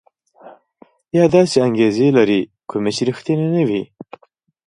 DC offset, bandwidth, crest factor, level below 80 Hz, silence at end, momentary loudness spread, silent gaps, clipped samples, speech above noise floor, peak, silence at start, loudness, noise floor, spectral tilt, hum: under 0.1%; 11 kHz; 18 dB; -58 dBFS; 0.8 s; 9 LU; none; under 0.1%; 43 dB; 0 dBFS; 0.45 s; -16 LUFS; -58 dBFS; -6.5 dB/octave; none